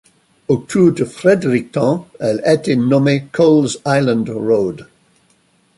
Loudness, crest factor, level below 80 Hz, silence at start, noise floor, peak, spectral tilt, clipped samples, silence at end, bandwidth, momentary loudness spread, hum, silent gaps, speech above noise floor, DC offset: -15 LUFS; 14 dB; -54 dBFS; 0.5 s; -57 dBFS; -2 dBFS; -6.5 dB/octave; under 0.1%; 0.95 s; 11.5 kHz; 7 LU; none; none; 42 dB; under 0.1%